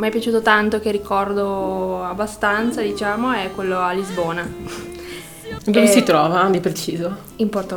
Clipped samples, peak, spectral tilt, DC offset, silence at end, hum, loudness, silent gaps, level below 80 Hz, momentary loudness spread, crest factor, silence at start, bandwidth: under 0.1%; 0 dBFS; -4.5 dB/octave; under 0.1%; 0 s; none; -19 LUFS; none; -46 dBFS; 16 LU; 20 dB; 0 s; 20 kHz